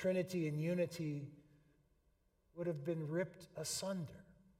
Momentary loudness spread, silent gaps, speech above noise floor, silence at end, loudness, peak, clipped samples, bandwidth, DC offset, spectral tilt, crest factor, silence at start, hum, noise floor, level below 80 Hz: 13 LU; none; 36 dB; 0.35 s; -42 LUFS; -26 dBFS; under 0.1%; 16 kHz; under 0.1%; -5.5 dB/octave; 16 dB; 0 s; none; -77 dBFS; -74 dBFS